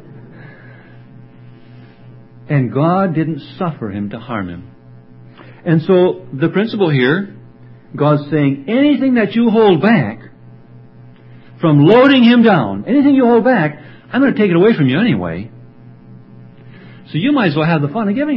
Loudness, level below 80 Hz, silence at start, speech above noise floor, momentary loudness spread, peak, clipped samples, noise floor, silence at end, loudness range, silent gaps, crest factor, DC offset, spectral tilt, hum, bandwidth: -13 LUFS; -52 dBFS; 0.15 s; 27 dB; 15 LU; 0 dBFS; under 0.1%; -39 dBFS; 0 s; 8 LU; none; 14 dB; under 0.1%; -10 dB/octave; none; 5.8 kHz